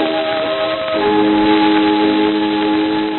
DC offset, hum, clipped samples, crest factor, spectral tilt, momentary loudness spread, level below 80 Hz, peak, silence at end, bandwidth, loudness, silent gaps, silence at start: under 0.1%; none; under 0.1%; 12 dB; -2.5 dB/octave; 5 LU; -50 dBFS; -2 dBFS; 0 s; 4.3 kHz; -14 LUFS; none; 0 s